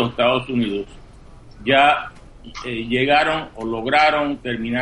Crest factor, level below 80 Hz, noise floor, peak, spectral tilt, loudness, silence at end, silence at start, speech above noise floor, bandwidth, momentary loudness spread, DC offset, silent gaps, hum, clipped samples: 18 dB; -44 dBFS; -42 dBFS; -2 dBFS; -5.5 dB/octave; -19 LUFS; 0 s; 0 s; 23 dB; 11 kHz; 14 LU; under 0.1%; none; none; under 0.1%